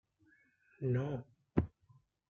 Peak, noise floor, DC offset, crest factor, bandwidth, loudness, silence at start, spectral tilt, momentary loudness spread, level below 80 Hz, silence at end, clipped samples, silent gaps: -14 dBFS; -71 dBFS; under 0.1%; 26 dB; 6.6 kHz; -39 LUFS; 0.8 s; -10 dB/octave; 9 LU; -60 dBFS; 0.6 s; under 0.1%; none